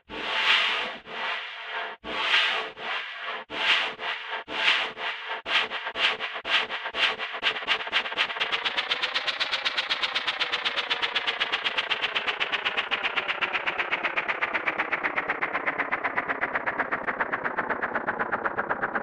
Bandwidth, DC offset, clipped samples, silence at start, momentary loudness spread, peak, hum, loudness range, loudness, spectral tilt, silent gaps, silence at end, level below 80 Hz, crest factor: 13 kHz; under 0.1%; under 0.1%; 0.1 s; 8 LU; -8 dBFS; none; 2 LU; -26 LUFS; -1.5 dB/octave; none; 0 s; -66 dBFS; 20 dB